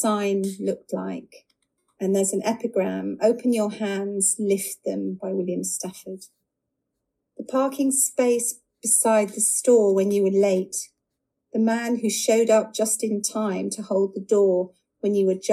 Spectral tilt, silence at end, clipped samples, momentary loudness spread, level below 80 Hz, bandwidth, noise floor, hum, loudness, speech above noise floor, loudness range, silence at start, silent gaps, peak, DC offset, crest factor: -4 dB/octave; 0 s; under 0.1%; 12 LU; -76 dBFS; 15.5 kHz; -80 dBFS; none; -23 LUFS; 58 dB; 6 LU; 0 s; none; -6 dBFS; under 0.1%; 18 dB